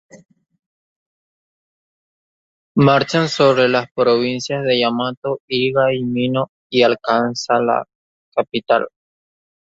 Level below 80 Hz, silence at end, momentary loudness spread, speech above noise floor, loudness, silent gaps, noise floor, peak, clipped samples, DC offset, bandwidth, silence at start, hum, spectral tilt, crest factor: -58 dBFS; 0.85 s; 9 LU; over 74 dB; -17 LUFS; 0.66-2.75 s, 3.91-3.95 s, 5.17-5.22 s, 5.40-5.48 s, 6.49-6.70 s, 7.95-8.32 s; under -90 dBFS; 0 dBFS; under 0.1%; under 0.1%; 8 kHz; 0.15 s; none; -5.5 dB/octave; 18 dB